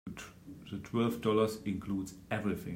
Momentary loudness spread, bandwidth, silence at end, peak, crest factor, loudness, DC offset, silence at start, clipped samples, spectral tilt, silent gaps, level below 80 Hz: 17 LU; 16 kHz; 0 s; -16 dBFS; 20 dB; -34 LUFS; under 0.1%; 0.05 s; under 0.1%; -6.5 dB/octave; none; -62 dBFS